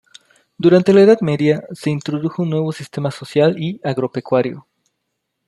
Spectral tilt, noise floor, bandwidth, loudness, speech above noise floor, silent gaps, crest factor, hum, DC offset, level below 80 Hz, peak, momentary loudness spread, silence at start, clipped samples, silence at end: -7.5 dB/octave; -74 dBFS; 12 kHz; -17 LUFS; 59 dB; none; 16 dB; none; under 0.1%; -60 dBFS; -2 dBFS; 13 LU; 0.6 s; under 0.1%; 0.9 s